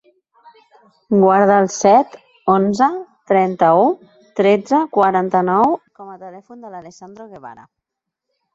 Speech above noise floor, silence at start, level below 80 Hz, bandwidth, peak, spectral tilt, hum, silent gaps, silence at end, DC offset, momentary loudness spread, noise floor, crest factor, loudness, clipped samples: 65 dB; 1.1 s; -62 dBFS; 7.8 kHz; -2 dBFS; -6 dB/octave; none; none; 1 s; under 0.1%; 23 LU; -81 dBFS; 16 dB; -15 LUFS; under 0.1%